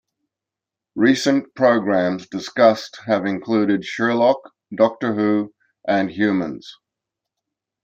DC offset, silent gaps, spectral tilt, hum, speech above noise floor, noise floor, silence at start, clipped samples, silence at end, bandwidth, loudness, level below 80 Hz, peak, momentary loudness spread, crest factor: under 0.1%; none; -5.5 dB/octave; none; 68 dB; -87 dBFS; 0.95 s; under 0.1%; 1.1 s; 14 kHz; -19 LUFS; -68 dBFS; -2 dBFS; 12 LU; 18 dB